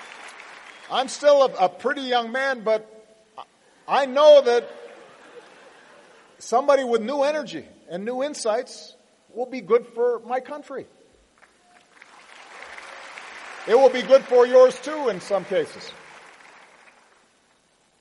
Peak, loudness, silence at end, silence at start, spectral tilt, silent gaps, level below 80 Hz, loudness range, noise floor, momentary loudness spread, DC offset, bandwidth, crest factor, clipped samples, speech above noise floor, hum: -4 dBFS; -20 LUFS; 2.05 s; 0 s; -3.5 dB/octave; none; -76 dBFS; 9 LU; -62 dBFS; 24 LU; under 0.1%; 11.5 kHz; 20 dB; under 0.1%; 42 dB; none